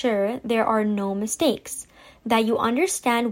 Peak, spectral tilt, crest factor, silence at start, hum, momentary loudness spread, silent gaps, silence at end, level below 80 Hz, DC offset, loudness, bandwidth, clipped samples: -8 dBFS; -4 dB/octave; 14 dB; 0 s; none; 10 LU; none; 0 s; -58 dBFS; under 0.1%; -23 LUFS; 16.5 kHz; under 0.1%